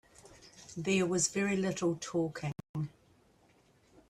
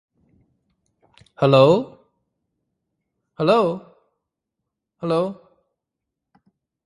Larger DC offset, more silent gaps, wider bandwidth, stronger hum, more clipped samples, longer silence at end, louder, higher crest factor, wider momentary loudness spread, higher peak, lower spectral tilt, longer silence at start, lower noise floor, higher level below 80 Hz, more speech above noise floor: neither; first, 2.69-2.74 s vs none; first, 13 kHz vs 11 kHz; neither; neither; second, 1.2 s vs 1.5 s; second, -33 LUFS vs -19 LUFS; about the same, 20 dB vs 24 dB; about the same, 15 LU vs 17 LU; second, -16 dBFS vs 0 dBFS; second, -4.5 dB/octave vs -7.5 dB/octave; second, 0.25 s vs 1.4 s; second, -67 dBFS vs -83 dBFS; about the same, -68 dBFS vs -64 dBFS; second, 34 dB vs 65 dB